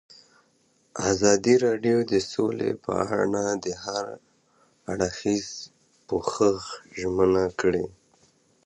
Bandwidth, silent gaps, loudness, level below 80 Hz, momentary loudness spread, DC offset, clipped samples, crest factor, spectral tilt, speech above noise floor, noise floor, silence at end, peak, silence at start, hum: 10 kHz; none; -25 LUFS; -54 dBFS; 16 LU; under 0.1%; under 0.1%; 22 dB; -4.5 dB/octave; 41 dB; -65 dBFS; 0.75 s; -4 dBFS; 0.95 s; none